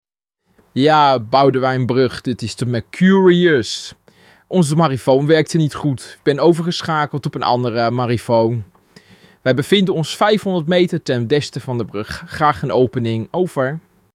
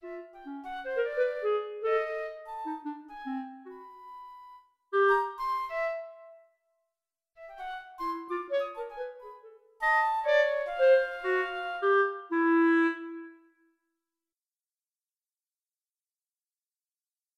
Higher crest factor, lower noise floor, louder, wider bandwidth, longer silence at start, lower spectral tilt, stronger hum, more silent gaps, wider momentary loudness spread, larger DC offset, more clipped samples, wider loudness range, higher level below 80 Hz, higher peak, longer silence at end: about the same, 16 dB vs 18 dB; second, -67 dBFS vs under -90 dBFS; first, -16 LUFS vs -29 LUFS; first, 15 kHz vs 11.5 kHz; first, 0.75 s vs 0.05 s; first, -6 dB/octave vs -3.5 dB/octave; neither; neither; second, 10 LU vs 22 LU; neither; neither; second, 3 LU vs 11 LU; first, -52 dBFS vs -68 dBFS; first, -2 dBFS vs -14 dBFS; second, 0.35 s vs 4.05 s